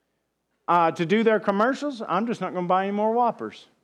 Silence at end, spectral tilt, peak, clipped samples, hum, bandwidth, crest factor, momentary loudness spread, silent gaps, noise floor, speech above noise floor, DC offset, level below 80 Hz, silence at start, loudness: 0.25 s; -6.5 dB/octave; -8 dBFS; under 0.1%; none; 10.5 kHz; 16 dB; 9 LU; none; -76 dBFS; 52 dB; under 0.1%; -76 dBFS; 0.7 s; -23 LUFS